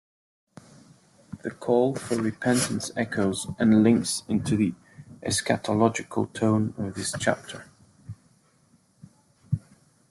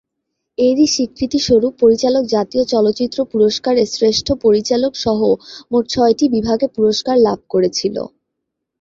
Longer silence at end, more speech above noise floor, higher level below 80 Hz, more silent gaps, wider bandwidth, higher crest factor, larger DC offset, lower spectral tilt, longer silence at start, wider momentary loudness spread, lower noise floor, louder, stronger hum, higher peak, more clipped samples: second, 0.55 s vs 0.75 s; second, 38 dB vs 62 dB; second, -60 dBFS vs -46 dBFS; neither; first, 12.5 kHz vs 7.8 kHz; first, 20 dB vs 14 dB; neither; about the same, -5 dB/octave vs -4.5 dB/octave; first, 1.3 s vs 0.6 s; first, 19 LU vs 6 LU; second, -63 dBFS vs -77 dBFS; second, -25 LUFS vs -15 LUFS; neither; second, -6 dBFS vs -2 dBFS; neither